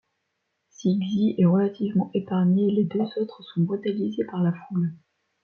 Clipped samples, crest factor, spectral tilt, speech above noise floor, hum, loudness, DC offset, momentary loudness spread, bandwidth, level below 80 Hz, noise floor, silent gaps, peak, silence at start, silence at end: under 0.1%; 14 dB; -9 dB/octave; 54 dB; none; -25 LUFS; under 0.1%; 8 LU; 6.6 kHz; -70 dBFS; -77 dBFS; none; -10 dBFS; 0.8 s; 0.45 s